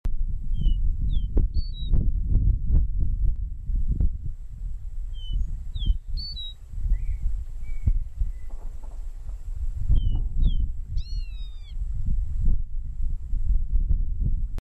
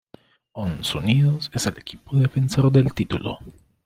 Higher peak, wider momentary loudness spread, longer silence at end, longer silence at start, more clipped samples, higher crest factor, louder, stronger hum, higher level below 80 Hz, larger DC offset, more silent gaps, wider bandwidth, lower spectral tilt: second, -10 dBFS vs -6 dBFS; about the same, 12 LU vs 14 LU; second, 0.05 s vs 0.35 s; second, 0.05 s vs 0.55 s; neither; about the same, 12 dB vs 16 dB; second, -30 LUFS vs -22 LUFS; neither; first, -26 dBFS vs -48 dBFS; neither; neither; second, 4.8 kHz vs 15.5 kHz; first, -8 dB/octave vs -6 dB/octave